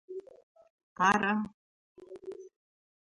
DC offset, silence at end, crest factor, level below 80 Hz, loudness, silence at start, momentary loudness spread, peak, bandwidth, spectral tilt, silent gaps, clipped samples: under 0.1%; 0.6 s; 22 dB; -70 dBFS; -29 LUFS; 0.1 s; 22 LU; -12 dBFS; 11 kHz; -4.5 dB/octave; 0.43-0.55 s, 0.70-0.96 s, 1.54-1.95 s; under 0.1%